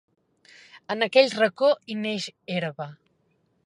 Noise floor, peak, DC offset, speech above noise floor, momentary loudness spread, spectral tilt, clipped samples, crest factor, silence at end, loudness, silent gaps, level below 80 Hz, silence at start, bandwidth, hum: -69 dBFS; -4 dBFS; under 0.1%; 45 dB; 13 LU; -4.5 dB/octave; under 0.1%; 22 dB; 0.7 s; -24 LUFS; none; -80 dBFS; 0.75 s; 11 kHz; none